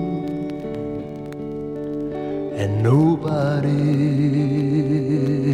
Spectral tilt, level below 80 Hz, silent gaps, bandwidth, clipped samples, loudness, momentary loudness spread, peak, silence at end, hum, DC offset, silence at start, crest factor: -9 dB/octave; -50 dBFS; none; 9.6 kHz; under 0.1%; -21 LUFS; 12 LU; -6 dBFS; 0 s; none; under 0.1%; 0 s; 14 dB